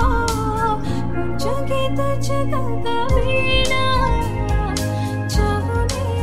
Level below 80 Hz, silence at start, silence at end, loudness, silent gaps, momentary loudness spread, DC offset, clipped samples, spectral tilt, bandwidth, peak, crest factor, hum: -26 dBFS; 0 s; 0 s; -20 LUFS; none; 6 LU; 6%; under 0.1%; -5.5 dB/octave; 15.5 kHz; -4 dBFS; 16 dB; none